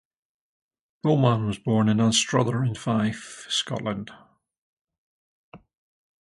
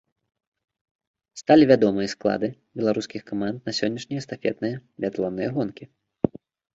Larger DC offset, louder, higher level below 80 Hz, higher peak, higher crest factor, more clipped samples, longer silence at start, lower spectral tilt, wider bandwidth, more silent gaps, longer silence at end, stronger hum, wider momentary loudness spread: neither; about the same, -24 LUFS vs -24 LUFS; about the same, -58 dBFS vs -60 dBFS; second, -6 dBFS vs -2 dBFS; about the same, 20 dB vs 22 dB; neither; second, 1.05 s vs 1.35 s; about the same, -5 dB/octave vs -6 dB/octave; first, 11.5 kHz vs 7.8 kHz; first, 4.58-4.85 s, 4.98-5.52 s vs none; first, 0.65 s vs 0.45 s; neither; second, 11 LU vs 14 LU